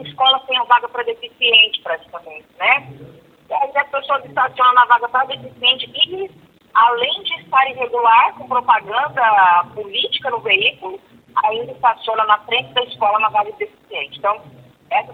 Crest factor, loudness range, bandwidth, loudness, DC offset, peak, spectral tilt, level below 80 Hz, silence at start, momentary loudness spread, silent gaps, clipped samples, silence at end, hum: 18 dB; 3 LU; 4.6 kHz; -16 LUFS; under 0.1%; 0 dBFS; -4 dB/octave; -64 dBFS; 0 s; 13 LU; none; under 0.1%; 0 s; none